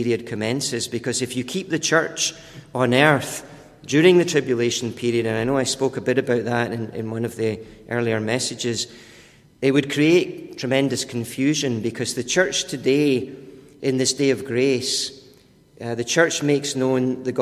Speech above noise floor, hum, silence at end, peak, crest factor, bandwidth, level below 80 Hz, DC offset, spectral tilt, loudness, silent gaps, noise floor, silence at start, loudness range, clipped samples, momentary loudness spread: 31 dB; none; 0 s; -2 dBFS; 20 dB; 15 kHz; -58 dBFS; under 0.1%; -4 dB/octave; -21 LUFS; none; -52 dBFS; 0 s; 4 LU; under 0.1%; 11 LU